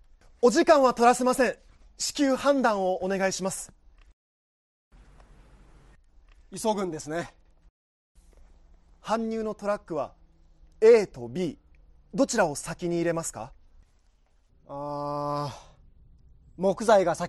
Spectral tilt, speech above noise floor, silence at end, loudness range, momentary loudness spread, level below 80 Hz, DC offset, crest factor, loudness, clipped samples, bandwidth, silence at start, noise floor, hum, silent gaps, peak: -4.5 dB/octave; 38 dB; 0 s; 12 LU; 18 LU; -56 dBFS; under 0.1%; 20 dB; -26 LUFS; under 0.1%; 12.5 kHz; 0.4 s; -63 dBFS; none; 4.13-4.91 s, 7.70-8.15 s; -8 dBFS